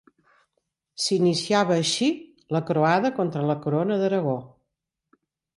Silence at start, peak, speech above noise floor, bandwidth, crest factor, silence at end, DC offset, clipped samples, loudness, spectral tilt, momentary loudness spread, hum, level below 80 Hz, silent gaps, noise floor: 1 s; -8 dBFS; 59 dB; 11.5 kHz; 16 dB; 1.1 s; under 0.1%; under 0.1%; -23 LUFS; -5 dB/octave; 8 LU; none; -68 dBFS; none; -82 dBFS